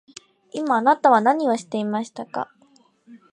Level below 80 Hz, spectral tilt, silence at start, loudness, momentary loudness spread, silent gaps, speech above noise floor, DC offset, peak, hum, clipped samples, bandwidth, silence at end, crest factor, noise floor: -76 dBFS; -5.5 dB/octave; 0.55 s; -21 LUFS; 15 LU; none; 38 dB; under 0.1%; -4 dBFS; none; under 0.1%; 10.5 kHz; 0.15 s; 20 dB; -58 dBFS